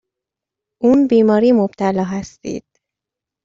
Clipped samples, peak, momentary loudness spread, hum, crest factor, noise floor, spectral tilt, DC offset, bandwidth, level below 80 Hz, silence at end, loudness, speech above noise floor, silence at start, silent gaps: under 0.1%; -2 dBFS; 16 LU; none; 14 dB; -85 dBFS; -7.5 dB/octave; under 0.1%; 7.6 kHz; -54 dBFS; 0.85 s; -15 LUFS; 70 dB; 0.8 s; none